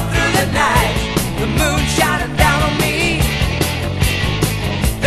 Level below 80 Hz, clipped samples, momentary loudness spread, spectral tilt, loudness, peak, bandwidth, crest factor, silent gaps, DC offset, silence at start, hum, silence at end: -24 dBFS; under 0.1%; 5 LU; -4.5 dB/octave; -16 LUFS; 0 dBFS; 14 kHz; 16 dB; none; under 0.1%; 0 s; none; 0 s